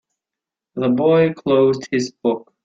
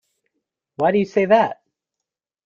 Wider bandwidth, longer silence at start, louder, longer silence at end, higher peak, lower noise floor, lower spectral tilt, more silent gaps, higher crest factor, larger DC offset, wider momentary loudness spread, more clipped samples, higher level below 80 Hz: about the same, 7.8 kHz vs 7.2 kHz; about the same, 0.75 s vs 0.8 s; about the same, -18 LUFS vs -18 LUFS; second, 0.25 s vs 0.95 s; about the same, -4 dBFS vs -4 dBFS; about the same, -86 dBFS vs -85 dBFS; about the same, -6.5 dB/octave vs -7 dB/octave; neither; about the same, 14 dB vs 18 dB; neither; about the same, 8 LU vs 6 LU; neither; about the same, -60 dBFS vs -64 dBFS